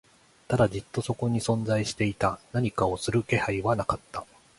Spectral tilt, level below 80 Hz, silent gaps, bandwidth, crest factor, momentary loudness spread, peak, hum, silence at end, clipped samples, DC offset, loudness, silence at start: -6 dB/octave; -50 dBFS; none; 11.5 kHz; 20 dB; 7 LU; -8 dBFS; none; 0.35 s; under 0.1%; under 0.1%; -27 LUFS; 0.5 s